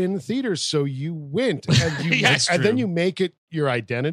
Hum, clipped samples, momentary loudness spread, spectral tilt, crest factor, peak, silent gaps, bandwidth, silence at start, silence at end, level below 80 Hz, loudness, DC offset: none; under 0.1%; 9 LU; -4.5 dB/octave; 20 dB; -2 dBFS; 3.38-3.47 s; 13.5 kHz; 0 s; 0 s; -54 dBFS; -21 LUFS; under 0.1%